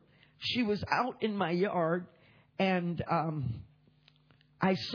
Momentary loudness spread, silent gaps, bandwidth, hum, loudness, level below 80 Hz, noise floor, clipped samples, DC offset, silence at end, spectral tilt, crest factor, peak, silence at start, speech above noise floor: 8 LU; none; 5.4 kHz; none; -32 LUFS; -62 dBFS; -65 dBFS; under 0.1%; under 0.1%; 0 s; -7 dB/octave; 20 dB; -14 dBFS; 0.4 s; 34 dB